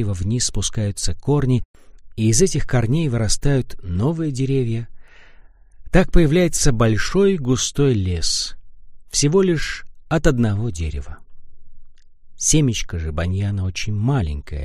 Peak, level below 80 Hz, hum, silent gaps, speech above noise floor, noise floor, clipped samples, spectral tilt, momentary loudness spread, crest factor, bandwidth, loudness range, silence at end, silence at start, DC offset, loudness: 0 dBFS; -28 dBFS; none; 1.65-1.74 s; 26 dB; -44 dBFS; under 0.1%; -5 dB/octave; 10 LU; 18 dB; 14 kHz; 4 LU; 0 s; 0 s; under 0.1%; -20 LUFS